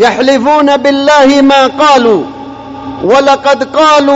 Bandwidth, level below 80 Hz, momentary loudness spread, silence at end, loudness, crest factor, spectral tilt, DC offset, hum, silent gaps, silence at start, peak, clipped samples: 8 kHz; -46 dBFS; 17 LU; 0 s; -7 LUFS; 6 dB; -3.5 dB/octave; under 0.1%; none; none; 0 s; 0 dBFS; 0.4%